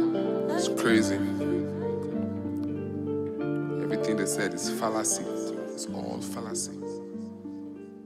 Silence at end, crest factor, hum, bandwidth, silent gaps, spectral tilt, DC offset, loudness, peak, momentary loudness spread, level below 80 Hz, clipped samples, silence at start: 0 s; 18 dB; none; 15.5 kHz; none; -4.5 dB/octave; under 0.1%; -30 LUFS; -12 dBFS; 12 LU; -70 dBFS; under 0.1%; 0 s